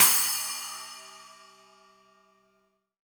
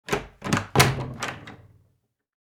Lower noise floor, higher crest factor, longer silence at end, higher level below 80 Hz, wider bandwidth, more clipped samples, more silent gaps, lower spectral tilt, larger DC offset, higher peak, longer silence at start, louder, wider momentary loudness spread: about the same, -72 dBFS vs -70 dBFS; about the same, 26 dB vs 26 dB; first, 1.8 s vs 1.05 s; second, -76 dBFS vs -48 dBFS; about the same, over 20 kHz vs over 20 kHz; neither; neither; second, 2 dB/octave vs -4 dB/octave; neither; second, -6 dBFS vs -2 dBFS; about the same, 0 s vs 0.1 s; about the same, -25 LUFS vs -24 LUFS; first, 26 LU vs 18 LU